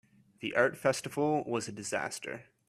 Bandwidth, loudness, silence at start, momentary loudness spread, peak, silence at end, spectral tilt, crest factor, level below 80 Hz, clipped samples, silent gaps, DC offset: 14.5 kHz; -32 LUFS; 0.4 s; 12 LU; -12 dBFS; 0.25 s; -4 dB/octave; 20 dB; -74 dBFS; under 0.1%; none; under 0.1%